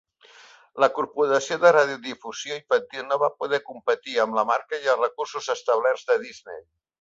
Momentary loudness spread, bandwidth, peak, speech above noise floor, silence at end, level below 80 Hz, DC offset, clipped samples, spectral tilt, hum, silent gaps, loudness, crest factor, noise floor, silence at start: 14 LU; 7.8 kHz; -4 dBFS; 28 dB; 0.4 s; -74 dBFS; under 0.1%; under 0.1%; -3 dB/octave; none; none; -24 LUFS; 20 dB; -52 dBFS; 0.75 s